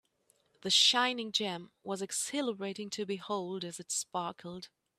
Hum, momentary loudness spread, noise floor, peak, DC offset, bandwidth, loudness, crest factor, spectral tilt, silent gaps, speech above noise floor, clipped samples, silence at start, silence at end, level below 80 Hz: none; 18 LU; -73 dBFS; -12 dBFS; under 0.1%; 15.5 kHz; -32 LUFS; 22 dB; -1.5 dB/octave; none; 39 dB; under 0.1%; 0.65 s; 0.35 s; -80 dBFS